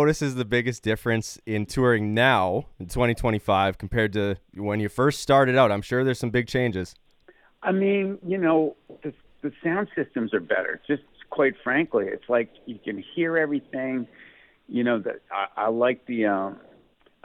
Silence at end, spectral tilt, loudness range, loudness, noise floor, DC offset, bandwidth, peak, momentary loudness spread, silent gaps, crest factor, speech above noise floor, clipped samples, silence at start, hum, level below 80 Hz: 0.7 s; -6 dB/octave; 5 LU; -25 LUFS; -59 dBFS; under 0.1%; 16 kHz; -6 dBFS; 12 LU; none; 20 dB; 35 dB; under 0.1%; 0 s; none; -48 dBFS